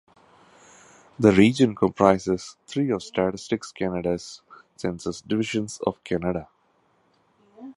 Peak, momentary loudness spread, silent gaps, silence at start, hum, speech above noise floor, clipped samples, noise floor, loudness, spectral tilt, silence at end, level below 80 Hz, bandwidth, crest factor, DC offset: -2 dBFS; 14 LU; none; 1.2 s; none; 42 dB; under 0.1%; -65 dBFS; -24 LUFS; -6 dB/octave; 0.05 s; -52 dBFS; 11.5 kHz; 24 dB; under 0.1%